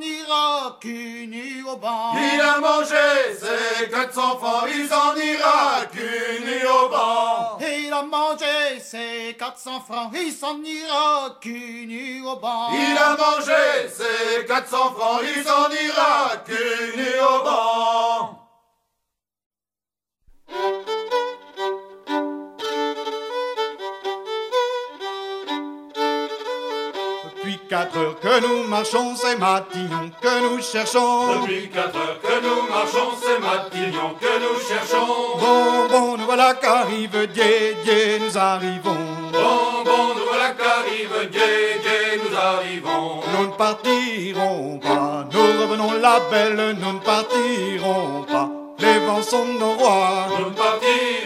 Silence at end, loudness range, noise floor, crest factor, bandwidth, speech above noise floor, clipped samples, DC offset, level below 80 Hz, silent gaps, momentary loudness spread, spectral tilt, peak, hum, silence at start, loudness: 0 s; 8 LU; under -90 dBFS; 20 dB; 16 kHz; over 70 dB; under 0.1%; under 0.1%; -72 dBFS; 19.46-19.50 s; 12 LU; -3 dB/octave; -2 dBFS; none; 0 s; -20 LUFS